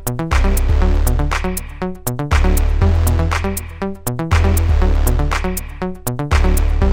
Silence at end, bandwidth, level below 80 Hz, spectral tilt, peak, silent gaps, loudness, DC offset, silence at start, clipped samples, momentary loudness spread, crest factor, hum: 0 s; 17 kHz; -16 dBFS; -5.5 dB/octave; -4 dBFS; none; -18 LUFS; under 0.1%; 0 s; under 0.1%; 8 LU; 12 dB; none